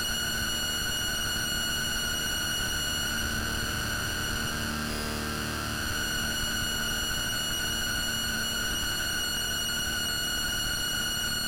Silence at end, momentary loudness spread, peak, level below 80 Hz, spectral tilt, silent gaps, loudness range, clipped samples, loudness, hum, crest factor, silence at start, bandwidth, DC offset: 0 s; 3 LU; -18 dBFS; -42 dBFS; -1.5 dB/octave; none; 2 LU; under 0.1%; -28 LUFS; none; 12 dB; 0 s; 16 kHz; under 0.1%